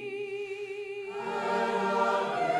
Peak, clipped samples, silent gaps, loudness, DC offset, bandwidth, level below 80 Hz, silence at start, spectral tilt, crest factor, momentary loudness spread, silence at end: -16 dBFS; under 0.1%; none; -31 LUFS; under 0.1%; 12.5 kHz; -80 dBFS; 0 s; -4.5 dB/octave; 14 dB; 10 LU; 0 s